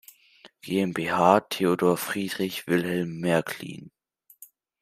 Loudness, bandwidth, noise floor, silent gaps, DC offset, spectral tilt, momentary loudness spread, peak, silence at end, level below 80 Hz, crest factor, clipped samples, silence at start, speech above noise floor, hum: -25 LUFS; 16 kHz; -55 dBFS; none; under 0.1%; -5.5 dB/octave; 15 LU; -4 dBFS; 0.35 s; -68 dBFS; 24 dB; under 0.1%; 0.45 s; 31 dB; none